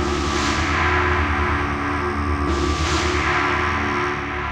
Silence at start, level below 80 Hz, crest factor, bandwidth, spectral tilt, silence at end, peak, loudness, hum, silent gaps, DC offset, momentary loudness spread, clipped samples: 0 s; -30 dBFS; 14 dB; 10.5 kHz; -5 dB/octave; 0 s; -6 dBFS; -20 LUFS; none; none; under 0.1%; 4 LU; under 0.1%